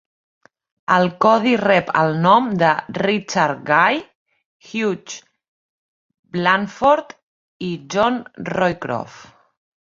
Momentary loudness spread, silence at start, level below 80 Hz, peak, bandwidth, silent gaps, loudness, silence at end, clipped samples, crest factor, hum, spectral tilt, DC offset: 14 LU; 0.9 s; -58 dBFS; -2 dBFS; 7.6 kHz; 4.15-4.26 s, 4.45-4.60 s, 5.48-6.09 s, 6.19-6.23 s, 7.23-7.60 s; -18 LUFS; 0.6 s; under 0.1%; 18 dB; none; -5.5 dB/octave; under 0.1%